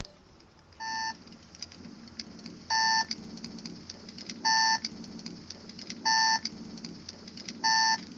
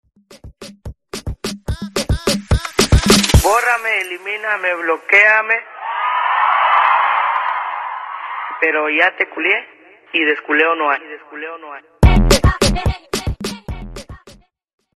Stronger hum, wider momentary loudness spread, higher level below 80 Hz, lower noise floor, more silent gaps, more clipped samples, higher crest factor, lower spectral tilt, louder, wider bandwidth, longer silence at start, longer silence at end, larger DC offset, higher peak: neither; about the same, 20 LU vs 18 LU; second, -68 dBFS vs -24 dBFS; first, -57 dBFS vs -46 dBFS; neither; neither; about the same, 18 dB vs 16 dB; second, -0.5 dB/octave vs -4 dB/octave; second, -27 LUFS vs -15 LUFS; second, 7.8 kHz vs 13.5 kHz; second, 0 s vs 0.3 s; second, 0 s vs 0.65 s; neither; second, -14 dBFS vs 0 dBFS